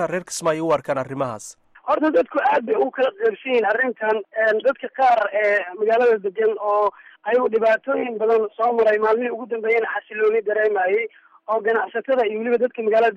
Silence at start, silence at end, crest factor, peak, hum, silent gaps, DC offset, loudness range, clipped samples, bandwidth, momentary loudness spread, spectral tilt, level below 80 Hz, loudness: 0 s; 0 s; 12 dB; -8 dBFS; none; none; under 0.1%; 2 LU; under 0.1%; 12 kHz; 8 LU; -4.5 dB/octave; -66 dBFS; -20 LUFS